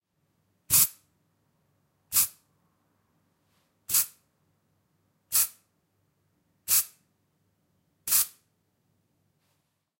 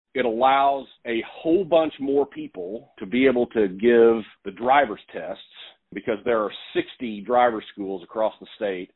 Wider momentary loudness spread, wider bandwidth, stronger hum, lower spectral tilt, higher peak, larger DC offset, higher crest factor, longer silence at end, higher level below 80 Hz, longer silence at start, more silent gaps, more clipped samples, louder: second, 12 LU vs 16 LU; first, 16.5 kHz vs 4.1 kHz; neither; second, 1 dB/octave vs -9.5 dB/octave; second, -8 dBFS vs -4 dBFS; neither; first, 26 dB vs 18 dB; first, 1.7 s vs 0.1 s; second, -68 dBFS vs -60 dBFS; first, 0.7 s vs 0.15 s; neither; neither; about the same, -24 LUFS vs -23 LUFS